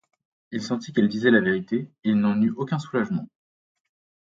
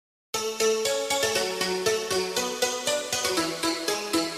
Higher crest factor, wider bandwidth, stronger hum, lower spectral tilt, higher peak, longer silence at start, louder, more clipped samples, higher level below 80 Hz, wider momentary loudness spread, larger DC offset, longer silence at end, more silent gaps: about the same, 20 dB vs 18 dB; second, 7.6 kHz vs 15.5 kHz; neither; first, -7 dB/octave vs -1.5 dB/octave; first, -4 dBFS vs -10 dBFS; first, 0.5 s vs 0.35 s; about the same, -24 LUFS vs -26 LUFS; neither; about the same, -64 dBFS vs -62 dBFS; first, 10 LU vs 3 LU; neither; first, 1 s vs 0 s; neither